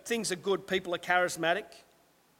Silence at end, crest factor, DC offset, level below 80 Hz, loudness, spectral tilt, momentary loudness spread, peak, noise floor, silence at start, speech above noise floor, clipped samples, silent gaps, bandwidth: 0.6 s; 20 dB; under 0.1%; -70 dBFS; -30 LUFS; -3 dB/octave; 5 LU; -12 dBFS; -65 dBFS; 0.05 s; 34 dB; under 0.1%; none; 17 kHz